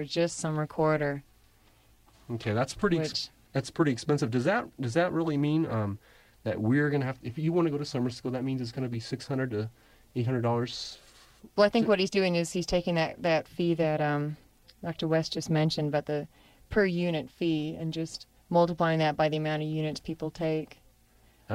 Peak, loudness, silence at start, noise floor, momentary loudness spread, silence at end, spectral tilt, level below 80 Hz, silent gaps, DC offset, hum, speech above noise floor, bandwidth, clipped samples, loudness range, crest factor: -10 dBFS; -29 LUFS; 0 s; -62 dBFS; 10 LU; 0 s; -6 dB/octave; -56 dBFS; none; under 0.1%; none; 33 dB; 15 kHz; under 0.1%; 4 LU; 18 dB